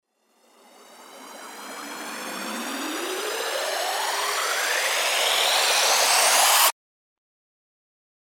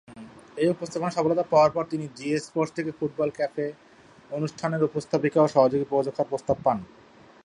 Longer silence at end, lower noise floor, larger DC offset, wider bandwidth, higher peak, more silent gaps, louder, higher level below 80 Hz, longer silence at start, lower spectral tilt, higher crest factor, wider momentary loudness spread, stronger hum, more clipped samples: first, 1.65 s vs 0.6 s; first, -63 dBFS vs -46 dBFS; neither; first, 18 kHz vs 11 kHz; about the same, -6 dBFS vs -6 dBFS; neither; first, -21 LUFS vs -25 LUFS; second, under -90 dBFS vs -62 dBFS; first, 0.9 s vs 0.1 s; second, 2 dB/octave vs -6.5 dB/octave; about the same, 20 dB vs 20 dB; first, 19 LU vs 12 LU; neither; neither